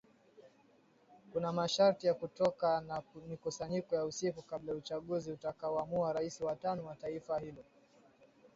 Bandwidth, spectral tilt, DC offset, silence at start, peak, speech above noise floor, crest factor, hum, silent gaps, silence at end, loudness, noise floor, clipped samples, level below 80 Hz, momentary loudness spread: 7.6 kHz; -5 dB/octave; under 0.1%; 0.4 s; -18 dBFS; 31 dB; 20 dB; none; none; 0.1 s; -37 LUFS; -68 dBFS; under 0.1%; -72 dBFS; 13 LU